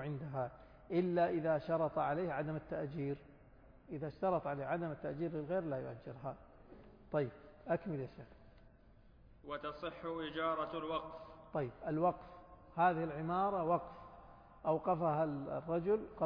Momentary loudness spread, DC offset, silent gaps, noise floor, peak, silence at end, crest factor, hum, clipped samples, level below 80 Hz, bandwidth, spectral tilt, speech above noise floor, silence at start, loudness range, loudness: 16 LU; under 0.1%; none; -63 dBFS; -20 dBFS; 0 s; 18 dB; none; under 0.1%; -64 dBFS; 5.2 kHz; -6 dB/octave; 25 dB; 0 s; 7 LU; -39 LUFS